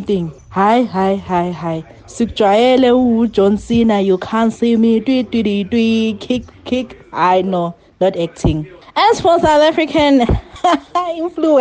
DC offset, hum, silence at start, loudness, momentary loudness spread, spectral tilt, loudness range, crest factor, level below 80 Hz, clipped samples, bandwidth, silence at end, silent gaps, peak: under 0.1%; none; 0 s; -15 LUFS; 10 LU; -6 dB/octave; 4 LU; 12 dB; -34 dBFS; under 0.1%; 9.2 kHz; 0 s; none; -2 dBFS